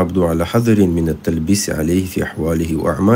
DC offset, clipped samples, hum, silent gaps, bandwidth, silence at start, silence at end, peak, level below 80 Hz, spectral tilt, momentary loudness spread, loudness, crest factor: under 0.1%; under 0.1%; none; none; 16.5 kHz; 0 s; 0 s; -2 dBFS; -34 dBFS; -6 dB/octave; 5 LU; -17 LUFS; 14 dB